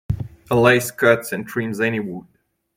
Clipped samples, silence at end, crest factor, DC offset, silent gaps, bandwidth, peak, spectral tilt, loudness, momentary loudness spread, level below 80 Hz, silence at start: under 0.1%; 0.55 s; 20 dB; under 0.1%; none; 16.5 kHz; 0 dBFS; -5.5 dB/octave; -19 LUFS; 13 LU; -44 dBFS; 0.1 s